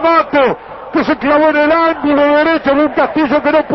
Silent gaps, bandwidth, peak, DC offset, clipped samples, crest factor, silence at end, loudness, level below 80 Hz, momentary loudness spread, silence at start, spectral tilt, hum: none; 6 kHz; 0 dBFS; under 0.1%; under 0.1%; 12 dB; 0 s; -12 LUFS; -44 dBFS; 5 LU; 0 s; -7 dB/octave; none